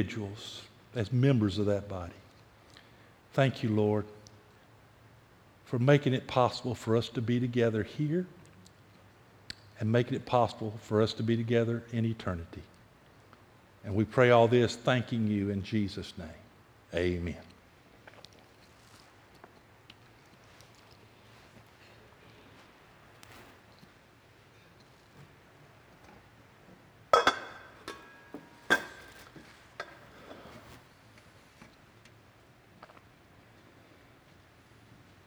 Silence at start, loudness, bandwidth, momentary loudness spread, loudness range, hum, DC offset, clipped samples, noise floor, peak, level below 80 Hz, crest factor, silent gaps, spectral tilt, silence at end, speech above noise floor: 0 s; -30 LUFS; 19 kHz; 25 LU; 11 LU; none; under 0.1%; under 0.1%; -59 dBFS; -8 dBFS; -62 dBFS; 26 dB; none; -6.5 dB/octave; 2.4 s; 30 dB